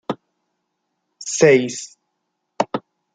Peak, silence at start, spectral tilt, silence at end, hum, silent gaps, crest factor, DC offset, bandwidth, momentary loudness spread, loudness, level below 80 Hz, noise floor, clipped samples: -2 dBFS; 0.1 s; -4 dB/octave; 0.35 s; none; none; 20 dB; under 0.1%; 9.6 kHz; 19 LU; -18 LUFS; -66 dBFS; -75 dBFS; under 0.1%